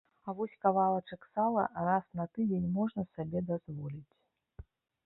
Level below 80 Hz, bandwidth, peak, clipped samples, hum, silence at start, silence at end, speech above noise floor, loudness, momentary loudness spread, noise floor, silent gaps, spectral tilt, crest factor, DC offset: -64 dBFS; 4.1 kHz; -14 dBFS; under 0.1%; none; 0.25 s; 0.45 s; 21 dB; -34 LUFS; 12 LU; -55 dBFS; none; -11.5 dB/octave; 20 dB; under 0.1%